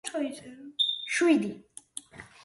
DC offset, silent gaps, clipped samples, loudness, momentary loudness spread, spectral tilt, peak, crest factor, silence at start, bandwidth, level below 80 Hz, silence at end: under 0.1%; none; under 0.1%; -27 LUFS; 20 LU; -3 dB/octave; -12 dBFS; 18 dB; 0.05 s; 11.5 kHz; -72 dBFS; 0.2 s